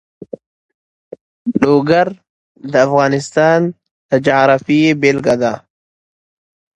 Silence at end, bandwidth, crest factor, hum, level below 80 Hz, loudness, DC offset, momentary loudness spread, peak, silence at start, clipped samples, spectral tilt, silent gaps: 1.15 s; 10.5 kHz; 16 dB; none; -54 dBFS; -13 LUFS; under 0.1%; 20 LU; 0 dBFS; 1.45 s; under 0.1%; -6 dB/octave; 2.29-2.55 s, 3.91-4.09 s